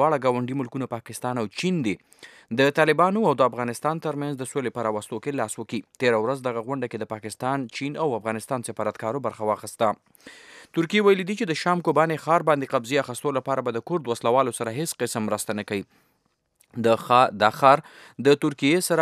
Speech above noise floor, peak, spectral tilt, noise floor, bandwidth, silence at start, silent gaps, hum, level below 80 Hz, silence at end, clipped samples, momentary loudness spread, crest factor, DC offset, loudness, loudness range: 47 dB; -2 dBFS; -5 dB/octave; -71 dBFS; 15.5 kHz; 0 s; none; none; -74 dBFS; 0 s; under 0.1%; 11 LU; 22 dB; under 0.1%; -24 LUFS; 5 LU